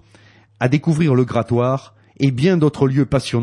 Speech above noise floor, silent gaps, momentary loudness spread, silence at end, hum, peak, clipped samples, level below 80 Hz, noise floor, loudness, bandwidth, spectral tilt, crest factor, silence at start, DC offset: 33 dB; none; 5 LU; 0 s; none; -2 dBFS; under 0.1%; -48 dBFS; -49 dBFS; -17 LUFS; 11.5 kHz; -7.5 dB/octave; 14 dB; 0.6 s; under 0.1%